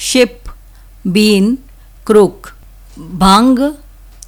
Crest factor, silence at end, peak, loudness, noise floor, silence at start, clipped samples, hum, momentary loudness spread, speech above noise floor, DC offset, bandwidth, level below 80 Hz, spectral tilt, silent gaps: 14 dB; 0.5 s; 0 dBFS; -11 LUFS; -38 dBFS; 0 s; under 0.1%; none; 14 LU; 27 dB; under 0.1%; 19.5 kHz; -34 dBFS; -5 dB/octave; none